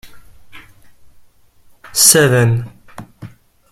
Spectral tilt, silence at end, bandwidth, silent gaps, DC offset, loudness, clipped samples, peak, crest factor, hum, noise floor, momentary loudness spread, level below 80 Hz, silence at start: -3 dB/octave; 0.45 s; 16.5 kHz; none; under 0.1%; -11 LUFS; under 0.1%; 0 dBFS; 18 dB; none; -47 dBFS; 24 LU; -48 dBFS; 0.05 s